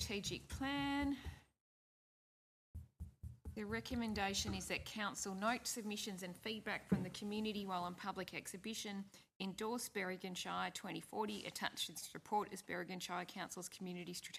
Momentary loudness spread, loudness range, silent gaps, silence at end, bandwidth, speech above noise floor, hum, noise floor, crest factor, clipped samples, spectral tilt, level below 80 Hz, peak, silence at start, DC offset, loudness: 10 LU; 4 LU; 1.61-2.74 s, 9.36-9.40 s; 0 s; 15 kHz; over 46 dB; none; under -90 dBFS; 24 dB; under 0.1%; -3.5 dB/octave; -64 dBFS; -22 dBFS; 0 s; under 0.1%; -44 LUFS